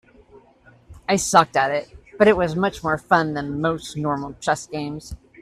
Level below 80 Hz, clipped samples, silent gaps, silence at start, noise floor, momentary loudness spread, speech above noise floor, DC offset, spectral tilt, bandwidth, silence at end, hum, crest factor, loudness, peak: -48 dBFS; under 0.1%; none; 0.9 s; -53 dBFS; 13 LU; 32 dB; under 0.1%; -4.5 dB/octave; 14 kHz; 0.25 s; none; 22 dB; -21 LUFS; 0 dBFS